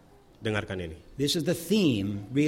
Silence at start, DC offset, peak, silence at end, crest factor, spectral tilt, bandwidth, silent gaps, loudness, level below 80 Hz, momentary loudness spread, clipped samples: 0.4 s; under 0.1%; -12 dBFS; 0 s; 16 dB; -5 dB/octave; 16 kHz; none; -28 LUFS; -54 dBFS; 12 LU; under 0.1%